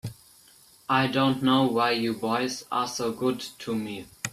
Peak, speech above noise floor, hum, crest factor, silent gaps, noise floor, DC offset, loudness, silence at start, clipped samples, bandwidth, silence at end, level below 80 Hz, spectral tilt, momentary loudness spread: -8 dBFS; 30 dB; none; 18 dB; none; -56 dBFS; under 0.1%; -26 LUFS; 0.05 s; under 0.1%; 14.5 kHz; 0.05 s; -64 dBFS; -4.5 dB/octave; 12 LU